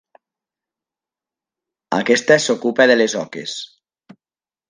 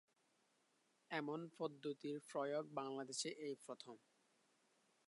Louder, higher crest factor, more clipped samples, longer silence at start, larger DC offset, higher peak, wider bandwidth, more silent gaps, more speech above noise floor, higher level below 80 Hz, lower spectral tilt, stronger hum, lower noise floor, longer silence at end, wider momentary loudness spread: first, -16 LUFS vs -48 LUFS; about the same, 20 dB vs 20 dB; neither; first, 1.9 s vs 1.1 s; neither; first, 0 dBFS vs -30 dBFS; second, 10 kHz vs 11.5 kHz; neither; first, over 74 dB vs 34 dB; first, -68 dBFS vs under -90 dBFS; about the same, -3.5 dB/octave vs -3.5 dB/octave; neither; first, under -90 dBFS vs -81 dBFS; about the same, 1.05 s vs 1.1 s; first, 15 LU vs 10 LU